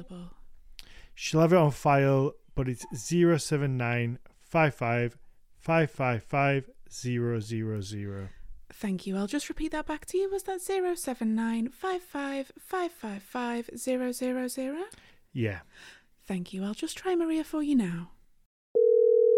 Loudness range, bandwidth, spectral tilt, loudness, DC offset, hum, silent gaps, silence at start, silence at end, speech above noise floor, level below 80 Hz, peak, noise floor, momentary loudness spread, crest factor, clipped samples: 7 LU; 16 kHz; -6 dB/octave; -29 LUFS; under 0.1%; none; 18.46-18.75 s; 0 s; 0 s; 19 dB; -52 dBFS; -12 dBFS; -48 dBFS; 14 LU; 18 dB; under 0.1%